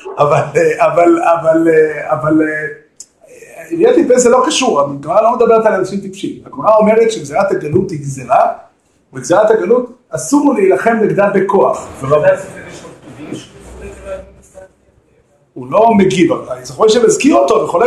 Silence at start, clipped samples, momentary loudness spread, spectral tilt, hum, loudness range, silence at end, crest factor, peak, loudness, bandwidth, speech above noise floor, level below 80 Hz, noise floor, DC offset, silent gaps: 0.05 s; under 0.1%; 19 LU; -5 dB/octave; none; 6 LU; 0 s; 12 dB; 0 dBFS; -11 LUFS; 12.5 kHz; 41 dB; -48 dBFS; -52 dBFS; under 0.1%; none